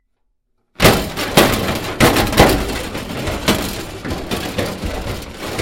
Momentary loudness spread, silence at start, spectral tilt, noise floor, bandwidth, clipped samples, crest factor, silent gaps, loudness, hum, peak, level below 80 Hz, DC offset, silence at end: 13 LU; 0.8 s; -4 dB/octave; -66 dBFS; 17 kHz; under 0.1%; 18 dB; none; -17 LUFS; none; 0 dBFS; -30 dBFS; under 0.1%; 0 s